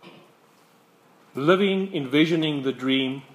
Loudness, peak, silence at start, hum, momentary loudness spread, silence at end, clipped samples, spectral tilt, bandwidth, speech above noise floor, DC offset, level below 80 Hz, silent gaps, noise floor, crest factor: -23 LUFS; -4 dBFS; 0.05 s; none; 6 LU; 0.15 s; under 0.1%; -6.5 dB/octave; 14 kHz; 35 dB; under 0.1%; -78 dBFS; none; -58 dBFS; 20 dB